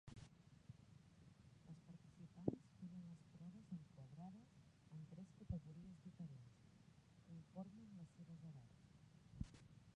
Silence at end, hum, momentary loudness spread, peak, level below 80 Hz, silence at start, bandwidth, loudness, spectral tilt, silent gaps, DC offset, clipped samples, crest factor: 0 s; none; 15 LU; -26 dBFS; -70 dBFS; 0.05 s; 10 kHz; -58 LUFS; -8 dB/octave; none; under 0.1%; under 0.1%; 32 dB